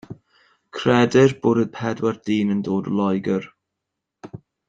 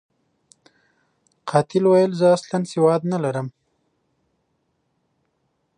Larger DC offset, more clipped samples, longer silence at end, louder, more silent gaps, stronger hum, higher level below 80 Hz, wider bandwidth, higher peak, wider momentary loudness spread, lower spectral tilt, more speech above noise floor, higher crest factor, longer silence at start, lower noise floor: neither; neither; second, 0.3 s vs 2.3 s; about the same, -20 LUFS vs -19 LUFS; neither; neither; first, -60 dBFS vs -72 dBFS; second, 7.8 kHz vs 10.5 kHz; about the same, -2 dBFS vs -4 dBFS; first, 18 LU vs 12 LU; about the same, -6.5 dB/octave vs -7 dB/octave; first, 62 dB vs 52 dB; about the same, 18 dB vs 20 dB; second, 0.1 s vs 1.45 s; first, -82 dBFS vs -71 dBFS